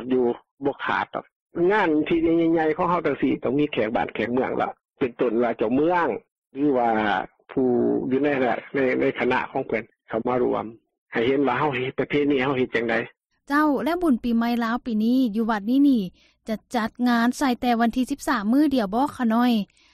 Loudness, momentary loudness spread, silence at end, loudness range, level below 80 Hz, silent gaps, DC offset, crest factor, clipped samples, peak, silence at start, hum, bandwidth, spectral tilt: -23 LUFS; 9 LU; 0.3 s; 2 LU; -54 dBFS; 0.51-0.57 s, 1.32-1.46 s, 6.32-6.42 s, 10.98-11.06 s; under 0.1%; 14 dB; under 0.1%; -8 dBFS; 0 s; none; 14.5 kHz; -6 dB/octave